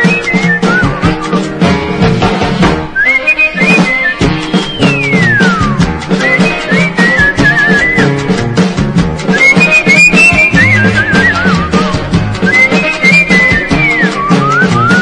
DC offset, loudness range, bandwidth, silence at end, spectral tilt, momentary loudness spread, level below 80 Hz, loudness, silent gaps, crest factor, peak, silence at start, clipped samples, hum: under 0.1%; 4 LU; 11 kHz; 0 s; -5.5 dB/octave; 7 LU; -28 dBFS; -7 LUFS; none; 8 dB; 0 dBFS; 0 s; 0.7%; none